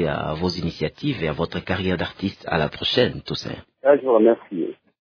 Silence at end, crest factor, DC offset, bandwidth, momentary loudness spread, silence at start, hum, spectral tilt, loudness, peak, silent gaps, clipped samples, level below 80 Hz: 0.35 s; 20 dB; under 0.1%; 5.4 kHz; 12 LU; 0 s; none; -6.5 dB/octave; -22 LUFS; -2 dBFS; none; under 0.1%; -46 dBFS